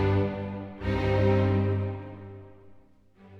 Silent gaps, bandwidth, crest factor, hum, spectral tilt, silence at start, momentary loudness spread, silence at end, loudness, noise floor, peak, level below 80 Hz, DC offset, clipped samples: none; 5.8 kHz; 14 dB; none; -9 dB/octave; 0 s; 20 LU; 0 s; -27 LUFS; -56 dBFS; -14 dBFS; -44 dBFS; under 0.1%; under 0.1%